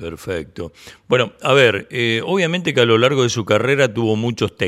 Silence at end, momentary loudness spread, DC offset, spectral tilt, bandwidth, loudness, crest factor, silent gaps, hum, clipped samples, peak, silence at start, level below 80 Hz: 0 s; 13 LU; under 0.1%; -5 dB/octave; 13.5 kHz; -17 LUFS; 16 dB; none; none; under 0.1%; 0 dBFS; 0 s; -52 dBFS